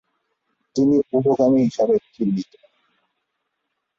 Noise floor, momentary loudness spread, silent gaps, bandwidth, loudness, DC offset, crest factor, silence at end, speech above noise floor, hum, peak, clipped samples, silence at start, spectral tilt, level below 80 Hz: -77 dBFS; 11 LU; none; 7.4 kHz; -20 LUFS; under 0.1%; 16 dB; 1.55 s; 58 dB; none; -6 dBFS; under 0.1%; 0.75 s; -8 dB/octave; -62 dBFS